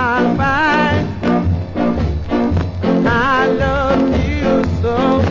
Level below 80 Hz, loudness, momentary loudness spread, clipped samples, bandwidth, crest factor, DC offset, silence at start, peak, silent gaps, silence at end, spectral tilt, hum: -26 dBFS; -15 LUFS; 5 LU; under 0.1%; 7.6 kHz; 12 dB; under 0.1%; 0 s; -2 dBFS; none; 0 s; -7.5 dB/octave; none